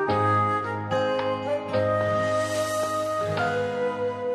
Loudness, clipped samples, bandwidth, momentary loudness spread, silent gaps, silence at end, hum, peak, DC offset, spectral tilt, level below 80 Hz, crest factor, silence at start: -25 LUFS; under 0.1%; 13.5 kHz; 5 LU; none; 0 s; none; -12 dBFS; under 0.1%; -5.5 dB/octave; -62 dBFS; 12 dB; 0 s